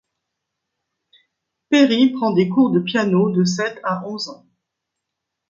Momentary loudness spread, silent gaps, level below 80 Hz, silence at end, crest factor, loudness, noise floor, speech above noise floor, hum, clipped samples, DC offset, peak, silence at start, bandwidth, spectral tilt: 11 LU; none; -66 dBFS; 1.15 s; 18 dB; -18 LUFS; -81 dBFS; 63 dB; none; under 0.1%; under 0.1%; -2 dBFS; 1.7 s; 7.6 kHz; -6 dB/octave